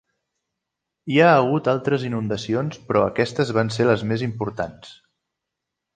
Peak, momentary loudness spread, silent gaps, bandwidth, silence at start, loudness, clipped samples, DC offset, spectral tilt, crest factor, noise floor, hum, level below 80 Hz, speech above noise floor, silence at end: -2 dBFS; 12 LU; none; 9.4 kHz; 1.05 s; -21 LUFS; under 0.1%; under 0.1%; -6.5 dB/octave; 20 dB; -83 dBFS; none; -56 dBFS; 62 dB; 1.05 s